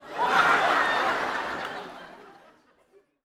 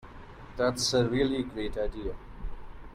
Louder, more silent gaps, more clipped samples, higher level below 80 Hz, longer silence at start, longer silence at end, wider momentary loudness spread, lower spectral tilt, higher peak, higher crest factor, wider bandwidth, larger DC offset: first, -24 LUFS vs -29 LUFS; neither; neither; second, -64 dBFS vs -42 dBFS; about the same, 0 s vs 0 s; first, 0.95 s vs 0 s; about the same, 19 LU vs 21 LU; second, -2.5 dB/octave vs -4.5 dB/octave; first, -8 dBFS vs -14 dBFS; about the same, 20 dB vs 18 dB; first, 17 kHz vs 15 kHz; neither